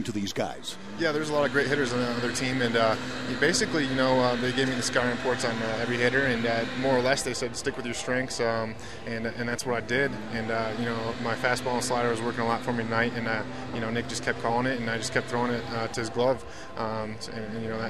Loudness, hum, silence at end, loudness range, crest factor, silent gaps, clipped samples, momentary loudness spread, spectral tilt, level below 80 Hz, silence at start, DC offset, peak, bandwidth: -28 LUFS; none; 0 s; 4 LU; 20 dB; none; under 0.1%; 9 LU; -4 dB/octave; -54 dBFS; 0 s; 0.8%; -8 dBFS; 14 kHz